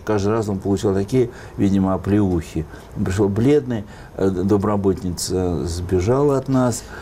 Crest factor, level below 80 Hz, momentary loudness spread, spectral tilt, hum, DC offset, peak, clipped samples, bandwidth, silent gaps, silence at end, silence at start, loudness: 12 dB; -40 dBFS; 8 LU; -7 dB/octave; none; under 0.1%; -8 dBFS; under 0.1%; 16 kHz; none; 0 s; 0 s; -20 LUFS